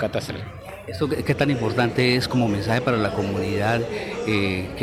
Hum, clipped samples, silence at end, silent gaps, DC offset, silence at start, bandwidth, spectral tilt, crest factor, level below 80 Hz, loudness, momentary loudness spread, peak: none; under 0.1%; 0 s; none; under 0.1%; 0 s; 15.5 kHz; -6 dB/octave; 16 dB; -46 dBFS; -23 LUFS; 11 LU; -6 dBFS